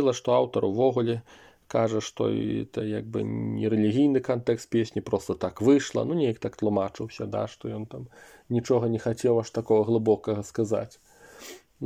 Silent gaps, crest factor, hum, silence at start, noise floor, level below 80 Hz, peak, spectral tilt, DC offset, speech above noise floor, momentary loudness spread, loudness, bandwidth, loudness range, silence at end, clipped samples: none; 18 dB; none; 0 s; -47 dBFS; -62 dBFS; -10 dBFS; -6.5 dB/octave; under 0.1%; 21 dB; 13 LU; -26 LUFS; 15.5 kHz; 3 LU; 0 s; under 0.1%